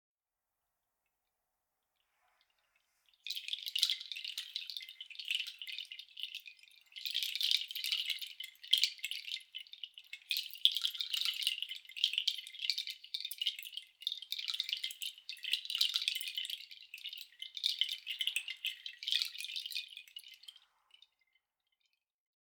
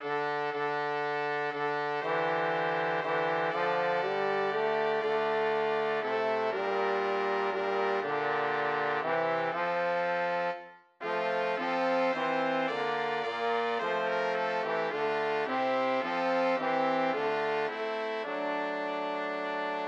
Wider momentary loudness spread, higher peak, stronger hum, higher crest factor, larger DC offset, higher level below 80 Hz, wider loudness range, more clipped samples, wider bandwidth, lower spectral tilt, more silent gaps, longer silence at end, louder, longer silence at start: first, 15 LU vs 4 LU; first, -8 dBFS vs -18 dBFS; neither; first, 34 dB vs 14 dB; neither; about the same, under -90 dBFS vs under -90 dBFS; first, 6 LU vs 1 LU; neither; first, over 20 kHz vs 8.2 kHz; second, 8.5 dB/octave vs -5.5 dB/octave; neither; first, 1.9 s vs 0 s; second, -36 LUFS vs -30 LUFS; first, 3.25 s vs 0 s